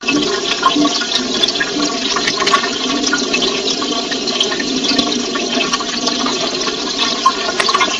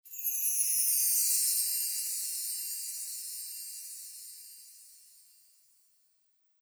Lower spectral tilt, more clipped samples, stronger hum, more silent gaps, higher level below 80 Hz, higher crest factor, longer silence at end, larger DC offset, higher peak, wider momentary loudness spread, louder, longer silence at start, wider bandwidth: first, -1.5 dB/octave vs 8.5 dB/octave; neither; neither; neither; first, -48 dBFS vs under -90 dBFS; about the same, 16 dB vs 20 dB; second, 0 s vs 1.65 s; neither; first, 0 dBFS vs -16 dBFS; second, 4 LU vs 20 LU; first, -15 LUFS vs -29 LUFS; about the same, 0 s vs 0.05 s; second, 11.5 kHz vs over 20 kHz